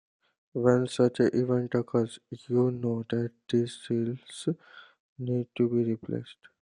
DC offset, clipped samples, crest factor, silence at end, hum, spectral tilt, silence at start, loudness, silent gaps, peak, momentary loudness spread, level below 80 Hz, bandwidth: under 0.1%; under 0.1%; 20 dB; 0.3 s; none; -7.5 dB/octave; 0.55 s; -29 LUFS; 5.00-5.16 s; -8 dBFS; 12 LU; -72 dBFS; 10.5 kHz